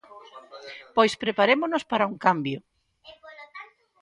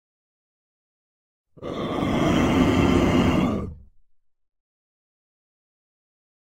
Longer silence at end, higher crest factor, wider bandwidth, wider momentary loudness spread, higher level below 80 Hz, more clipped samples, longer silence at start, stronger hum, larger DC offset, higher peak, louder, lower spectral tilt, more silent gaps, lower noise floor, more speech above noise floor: second, 0.35 s vs 2.6 s; about the same, 22 dB vs 20 dB; second, 11.5 kHz vs 16 kHz; first, 24 LU vs 14 LU; second, -70 dBFS vs -40 dBFS; neither; second, 0.15 s vs 1.6 s; neither; neither; about the same, -4 dBFS vs -6 dBFS; second, -24 LUFS vs -21 LUFS; second, -5 dB/octave vs -6.5 dB/octave; neither; second, -53 dBFS vs -61 dBFS; second, 29 dB vs 40 dB